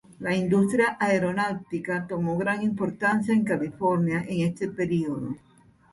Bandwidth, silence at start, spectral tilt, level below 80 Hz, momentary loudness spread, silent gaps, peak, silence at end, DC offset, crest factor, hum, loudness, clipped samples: 11.5 kHz; 0.1 s; -7 dB/octave; -60 dBFS; 7 LU; none; -10 dBFS; 0.55 s; under 0.1%; 16 dB; none; -26 LUFS; under 0.1%